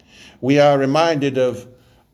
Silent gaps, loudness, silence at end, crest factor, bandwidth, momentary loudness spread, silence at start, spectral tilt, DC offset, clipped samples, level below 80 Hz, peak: none; -17 LUFS; 0.5 s; 16 dB; 12.5 kHz; 11 LU; 0.4 s; -6 dB/octave; under 0.1%; under 0.1%; -60 dBFS; -2 dBFS